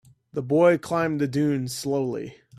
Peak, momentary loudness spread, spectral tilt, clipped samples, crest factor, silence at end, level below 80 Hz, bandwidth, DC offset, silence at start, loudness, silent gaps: -8 dBFS; 14 LU; -6.5 dB/octave; under 0.1%; 16 dB; 0.25 s; -64 dBFS; 15 kHz; under 0.1%; 0.35 s; -24 LUFS; none